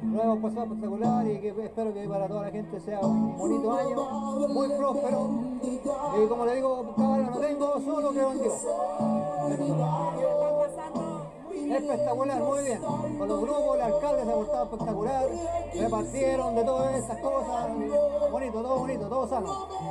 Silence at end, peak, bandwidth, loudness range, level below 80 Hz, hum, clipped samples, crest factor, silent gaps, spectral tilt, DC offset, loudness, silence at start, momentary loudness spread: 0 s; -14 dBFS; 11.5 kHz; 2 LU; -52 dBFS; none; under 0.1%; 14 dB; none; -6.5 dB/octave; under 0.1%; -28 LUFS; 0 s; 6 LU